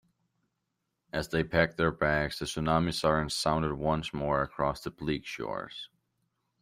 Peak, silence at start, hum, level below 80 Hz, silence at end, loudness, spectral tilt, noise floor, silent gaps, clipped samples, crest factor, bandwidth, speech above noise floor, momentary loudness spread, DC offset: -8 dBFS; 1.15 s; none; -50 dBFS; 0.75 s; -30 LUFS; -5 dB/octave; -82 dBFS; none; under 0.1%; 22 dB; 15.5 kHz; 52 dB; 10 LU; under 0.1%